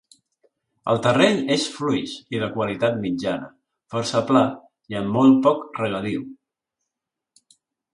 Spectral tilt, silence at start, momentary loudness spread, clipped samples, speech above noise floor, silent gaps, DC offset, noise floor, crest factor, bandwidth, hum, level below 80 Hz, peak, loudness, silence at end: -5.5 dB/octave; 0.85 s; 14 LU; under 0.1%; 64 dB; none; under 0.1%; -85 dBFS; 20 dB; 11.5 kHz; none; -60 dBFS; -4 dBFS; -22 LUFS; 1.6 s